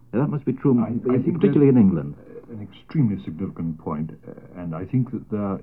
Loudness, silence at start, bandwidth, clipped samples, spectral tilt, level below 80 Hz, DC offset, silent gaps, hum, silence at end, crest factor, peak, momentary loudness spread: -22 LUFS; 0.15 s; 5 kHz; under 0.1%; -12 dB/octave; -54 dBFS; 0.2%; none; none; 0 s; 18 dB; -4 dBFS; 22 LU